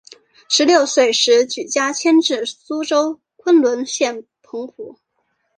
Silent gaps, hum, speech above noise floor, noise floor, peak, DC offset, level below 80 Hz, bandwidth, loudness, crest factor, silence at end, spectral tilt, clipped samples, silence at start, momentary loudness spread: none; none; 53 dB; -69 dBFS; -2 dBFS; under 0.1%; -70 dBFS; 10 kHz; -16 LUFS; 16 dB; 0.65 s; -1 dB/octave; under 0.1%; 0.5 s; 18 LU